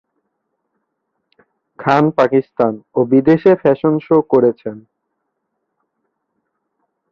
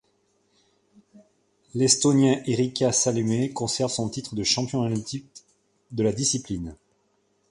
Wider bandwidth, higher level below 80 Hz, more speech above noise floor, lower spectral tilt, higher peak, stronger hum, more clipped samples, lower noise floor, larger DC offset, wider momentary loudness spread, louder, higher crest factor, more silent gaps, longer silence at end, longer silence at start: second, 6.8 kHz vs 11.5 kHz; about the same, -58 dBFS vs -56 dBFS; first, 59 dB vs 45 dB; first, -9 dB/octave vs -4 dB/octave; about the same, -2 dBFS vs -4 dBFS; neither; neither; first, -73 dBFS vs -69 dBFS; neither; second, 8 LU vs 15 LU; first, -14 LUFS vs -24 LUFS; second, 16 dB vs 22 dB; neither; first, 2.35 s vs 0.75 s; first, 1.8 s vs 1.15 s